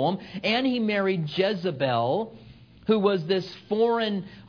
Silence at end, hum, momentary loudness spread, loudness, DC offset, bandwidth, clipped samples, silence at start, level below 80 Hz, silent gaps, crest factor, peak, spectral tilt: 0 s; none; 6 LU; -25 LUFS; under 0.1%; 5.4 kHz; under 0.1%; 0 s; -62 dBFS; none; 18 dB; -8 dBFS; -7.5 dB/octave